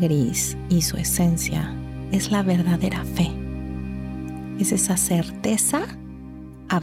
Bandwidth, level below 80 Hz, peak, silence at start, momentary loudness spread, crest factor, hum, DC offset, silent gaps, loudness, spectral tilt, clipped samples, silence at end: 16.5 kHz; -38 dBFS; -10 dBFS; 0 s; 13 LU; 14 dB; none; under 0.1%; none; -23 LUFS; -4.5 dB/octave; under 0.1%; 0 s